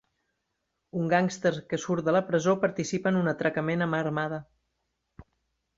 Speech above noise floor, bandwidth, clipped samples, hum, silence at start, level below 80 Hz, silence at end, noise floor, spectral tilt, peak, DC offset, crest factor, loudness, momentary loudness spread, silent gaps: 53 dB; 7.8 kHz; under 0.1%; none; 0.95 s; -66 dBFS; 0.55 s; -80 dBFS; -6 dB/octave; -10 dBFS; under 0.1%; 20 dB; -27 LUFS; 8 LU; none